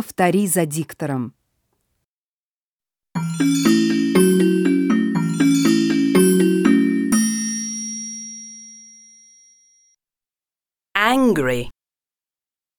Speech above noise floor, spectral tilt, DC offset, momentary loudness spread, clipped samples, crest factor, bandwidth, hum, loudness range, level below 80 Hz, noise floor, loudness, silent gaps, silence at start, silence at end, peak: over 70 dB; -5 dB/octave; under 0.1%; 15 LU; under 0.1%; 18 dB; 19 kHz; none; 10 LU; -54 dBFS; under -90 dBFS; -18 LUFS; 2.05-2.77 s; 0 s; 1.05 s; 0 dBFS